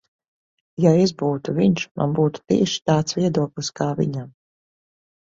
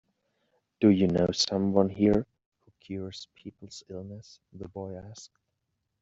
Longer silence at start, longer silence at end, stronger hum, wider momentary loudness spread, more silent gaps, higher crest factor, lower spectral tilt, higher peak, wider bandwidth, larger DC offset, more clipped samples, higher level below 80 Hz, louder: about the same, 0.8 s vs 0.8 s; first, 1 s vs 0.75 s; neither; second, 8 LU vs 22 LU; about the same, 1.91-1.95 s vs 2.46-2.52 s; about the same, 18 dB vs 22 dB; about the same, -6 dB/octave vs -6 dB/octave; first, -4 dBFS vs -8 dBFS; about the same, 7.8 kHz vs 7.8 kHz; neither; neither; about the same, -56 dBFS vs -58 dBFS; first, -21 LUFS vs -26 LUFS